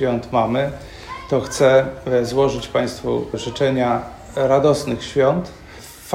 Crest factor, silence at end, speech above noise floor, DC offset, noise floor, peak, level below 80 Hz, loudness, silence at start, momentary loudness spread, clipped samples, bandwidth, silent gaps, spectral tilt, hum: 18 dB; 0 s; 20 dB; under 0.1%; -39 dBFS; -2 dBFS; -44 dBFS; -19 LUFS; 0 s; 18 LU; under 0.1%; 16 kHz; none; -5.5 dB/octave; none